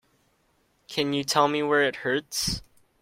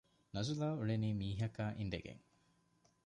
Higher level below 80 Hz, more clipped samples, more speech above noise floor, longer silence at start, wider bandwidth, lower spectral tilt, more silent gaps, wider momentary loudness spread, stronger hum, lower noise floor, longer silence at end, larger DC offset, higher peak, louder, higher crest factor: first, -52 dBFS vs -62 dBFS; neither; first, 43 dB vs 36 dB; first, 0.9 s vs 0.35 s; first, 16.5 kHz vs 10 kHz; second, -3 dB/octave vs -6.5 dB/octave; neither; second, 7 LU vs 10 LU; neither; second, -68 dBFS vs -75 dBFS; second, 0.4 s vs 0.9 s; neither; first, -6 dBFS vs -26 dBFS; first, -25 LUFS vs -41 LUFS; first, 22 dB vs 16 dB